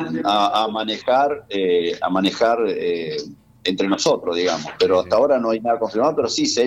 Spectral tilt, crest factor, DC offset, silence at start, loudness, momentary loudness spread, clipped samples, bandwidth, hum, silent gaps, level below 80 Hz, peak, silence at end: -4 dB/octave; 14 dB; under 0.1%; 0 s; -20 LUFS; 6 LU; under 0.1%; 11.5 kHz; none; none; -58 dBFS; -6 dBFS; 0 s